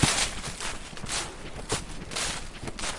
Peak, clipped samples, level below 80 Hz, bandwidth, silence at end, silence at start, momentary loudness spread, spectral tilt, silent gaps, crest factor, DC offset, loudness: -8 dBFS; under 0.1%; -42 dBFS; 11.5 kHz; 0 s; 0 s; 10 LU; -2.5 dB/octave; none; 24 dB; under 0.1%; -31 LUFS